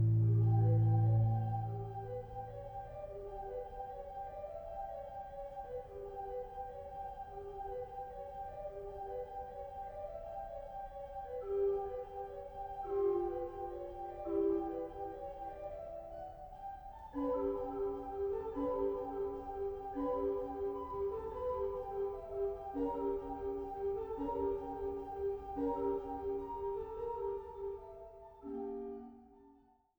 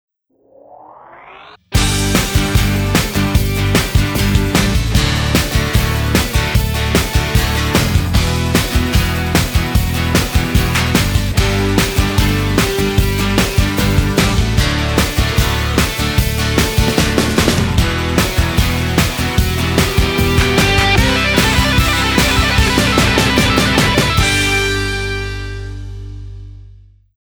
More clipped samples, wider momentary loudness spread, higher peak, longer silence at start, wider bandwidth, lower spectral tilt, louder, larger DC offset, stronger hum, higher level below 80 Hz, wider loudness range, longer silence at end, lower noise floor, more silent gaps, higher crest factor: neither; first, 12 LU vs 4 LU; second, -22 dBFS vs 0 dBFS; second, 0 s vs 0.7 s; about the same, over 20 kHz vs over 20 kHz; first, -11 dB/octave vs -4.5 dB/octave; second, -40 LUFS vs -14 LUFS; neither; neither; second, -56 dBFS vs -20 dBFS; first, 7 LU vs 3 LU; about the same, 0.45 s vs 0.55 s; first, -67 dBFS vs -51 dBFS; neither; about the same, 16 dB vs 14 dB